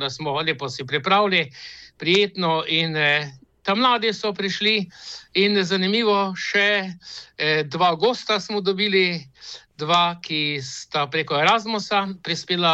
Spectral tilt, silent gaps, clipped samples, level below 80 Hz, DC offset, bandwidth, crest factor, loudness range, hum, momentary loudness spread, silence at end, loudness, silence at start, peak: -4 dB/octave; none; under 0.1%; -66 dBFS; under 0.1%; 8.2 kHz; 16 dB; 2 LU; none; 13 LU; 0 s; -21 LUFS; 0 s; -6 dBFS